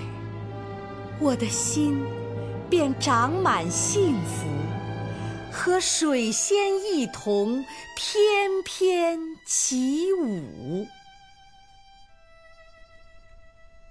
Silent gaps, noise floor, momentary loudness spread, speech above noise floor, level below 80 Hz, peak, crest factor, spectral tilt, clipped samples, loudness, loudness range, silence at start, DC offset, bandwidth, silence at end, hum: none; -53 dBFS; 12 LU; 29 dB; -56 dBFS; -10 dBFS; 16 dB; -4 dB/octave; under 0.1%; -25 LUFS; 6 LU; 0 s; under 0.1%; 11 kHz; 0.05 s; none